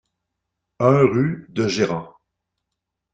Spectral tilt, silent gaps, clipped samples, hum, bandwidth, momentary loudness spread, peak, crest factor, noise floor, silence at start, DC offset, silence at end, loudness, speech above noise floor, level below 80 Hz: -6.5 dB/octave; none; under 0.1%; none; 8.4 kHz; 8 LU; -2 dBFS; 20 dB; -81 dBFS; 0.8 s; under 0.1%; 1.05 s; -20 LUFS; 63 dB; -58 dBFS